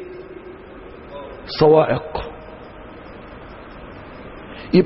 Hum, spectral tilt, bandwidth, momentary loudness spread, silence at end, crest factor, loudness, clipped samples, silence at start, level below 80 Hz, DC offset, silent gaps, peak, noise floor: none; -10.5 dB/octave; 5.8 kHz; 24 LU; 0 s; 20 dB; -17 LUFS; under 0.1%; 0 s; -44 dBFS; under 0.1%; none; -2 dBFS; -38 dBFS